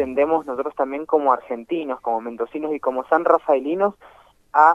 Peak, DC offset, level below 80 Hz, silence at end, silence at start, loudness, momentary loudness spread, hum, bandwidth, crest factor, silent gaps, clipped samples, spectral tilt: -2 dBFS; under 0.1%; -60 dBFS; 0 s; 0 s; -21 LUFS; 9 LU; none; 8 kHz; 20 dB; none; under 0.1%; -7 dB/octave